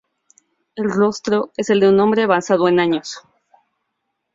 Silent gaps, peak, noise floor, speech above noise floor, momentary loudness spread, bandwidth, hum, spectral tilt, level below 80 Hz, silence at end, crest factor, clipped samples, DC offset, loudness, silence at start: none; -2 dBFS; -75 dBFS; 59 dB; 13 LU; 7.8 kHz; none; -5.5 dB/octave; -60 dBFS; 1.15 s; 16 dB; under 0.1%; under 0.1%; -17 LUFS; 0.75 s